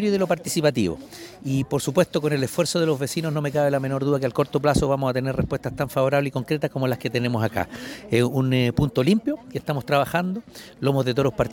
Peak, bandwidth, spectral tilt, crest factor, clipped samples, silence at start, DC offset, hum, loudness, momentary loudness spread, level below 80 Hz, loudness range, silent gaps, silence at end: -6 dBFS; 17 kHz; -6 dB/octave; 18 dB; under 0.1%; 0 s; under 0.1%; none; -23 LUFS; 7 LU; -46 dBFS; 1 LU; none; 0 s